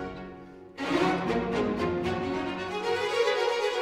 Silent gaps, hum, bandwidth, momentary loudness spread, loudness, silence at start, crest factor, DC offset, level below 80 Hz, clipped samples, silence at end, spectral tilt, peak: none; none; 15.5 kHz; 15 LU; -28 LUFS; 0 s; 16 dB; under 0.1%; -54 dBFS; under 0.1%; 0 s; -5 dB/octave; -14 dBFS